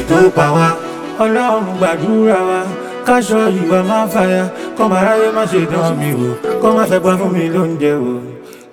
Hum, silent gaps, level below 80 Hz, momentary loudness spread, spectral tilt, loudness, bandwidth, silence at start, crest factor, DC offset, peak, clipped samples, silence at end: none; none; -48 dBFS; 8 LU; -6.5 dB/octave; -14 LUFS; 18 kHz; 0 s; 14 dB; under 0.1%; 0 dBFS; under 0.1%; 0.1 s